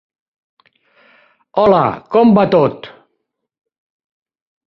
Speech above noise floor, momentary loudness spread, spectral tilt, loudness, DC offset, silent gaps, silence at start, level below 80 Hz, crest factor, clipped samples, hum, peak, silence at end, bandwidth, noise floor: 60 dB; 10 LU; -9.5 dB/octave; -13 LUFS; under 0.1%; none; 1.55 s; -52 dBFS; 16 dB; under 0.1%; none; -2 dBFS; 1.8 s; 5.8 kHz; -72 dBFS